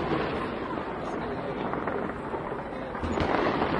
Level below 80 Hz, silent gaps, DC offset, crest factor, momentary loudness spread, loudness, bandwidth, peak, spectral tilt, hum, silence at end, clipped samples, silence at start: -48 dBFS; none; under 0.1%; 20 dB; 8 LU; -31 LUFS; 11 kHz; -10 dBFS; -7 dB/octave; none; 0 s; under 0.1%; 0 s